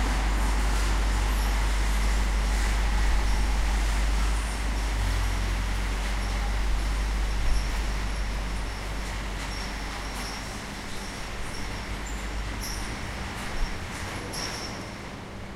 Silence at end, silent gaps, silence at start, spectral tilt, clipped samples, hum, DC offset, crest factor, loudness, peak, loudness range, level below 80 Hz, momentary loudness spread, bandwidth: 0 s; none; 0 s; -4 dB/octave; under 0.1%; none; under 0.1%; 14 dB; -30 LUFS; -12 dBFS; 7 LU; -28 dBFS; 8 LU; 14 kHz